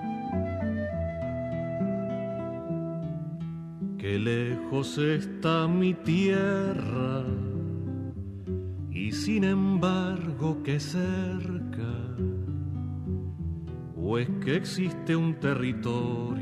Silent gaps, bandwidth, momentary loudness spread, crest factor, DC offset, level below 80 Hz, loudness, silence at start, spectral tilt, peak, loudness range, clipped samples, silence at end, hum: none; 12 kHz; 10 LU; 16 dB; under 0.1%; -52 dBFS; -30 LUFS; 0 s; -7 dB/octave; -12 dBFS; 5 LU; under 0.1%; 0 s; none